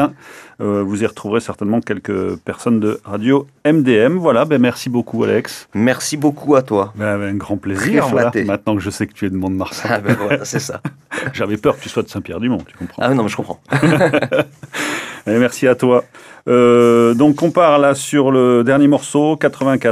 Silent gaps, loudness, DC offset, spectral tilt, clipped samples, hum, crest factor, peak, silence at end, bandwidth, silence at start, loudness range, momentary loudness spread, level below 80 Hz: none; -16 LUFS; under 0.1%; -6 dB/octave; under 0.1%; none; 14 dB; 0 dBFS; 0 s; 15 kHz; 0 s; 7 LU; 10 LU; -54 dBFS